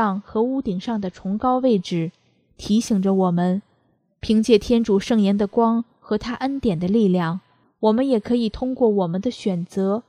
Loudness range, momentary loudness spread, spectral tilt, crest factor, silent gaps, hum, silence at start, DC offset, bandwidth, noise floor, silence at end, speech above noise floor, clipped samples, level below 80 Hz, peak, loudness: 2 LU; 8 LU; -7 dB/octave; 18 dB; none; none; 0 s; under 0.1%; 10.5 kHz; -64 dBFS; 0.05 s; 44 dB; under 0.1%; -48 dBFS; -2 dBFS; -21 LUFS